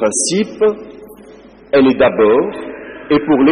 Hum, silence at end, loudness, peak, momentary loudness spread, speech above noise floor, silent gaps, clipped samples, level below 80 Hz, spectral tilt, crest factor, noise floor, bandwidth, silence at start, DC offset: none; 0 s; -13 LUFS; -4 dBFS; 18 LU; 27 dB; none; under 0.1%; -48 dBFS; -4 dB/octave; 10 dB; -39 dBFS; 11 kHz; 0 s; under 0.1%